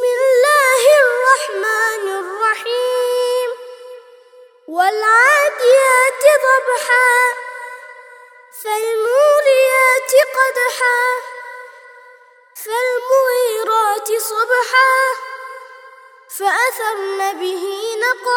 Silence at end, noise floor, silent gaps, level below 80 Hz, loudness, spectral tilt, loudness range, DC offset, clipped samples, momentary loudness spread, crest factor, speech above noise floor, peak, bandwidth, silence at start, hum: 0 s; -46 dBFS; none; -80 dBFS; -14 LUFS; 1.5 dB/octave; 6 LU; under 0.1%; under 0.1%; 18 LU; 16 dB; 29 dB; 0 dBFS; 19.5 kHz; 0 s; none